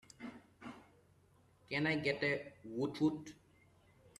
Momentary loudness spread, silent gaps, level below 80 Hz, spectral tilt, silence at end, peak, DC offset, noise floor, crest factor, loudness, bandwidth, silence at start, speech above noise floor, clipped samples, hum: 19 LU; none; -74 dBFS; -6 dB/octave; 0.85 s; -22 dBFS; under 0.1%; -69 dBFS; 20 dB; -38 LUFS; 12 kHz; 0.2 s; 31 dB; under 0.1%; none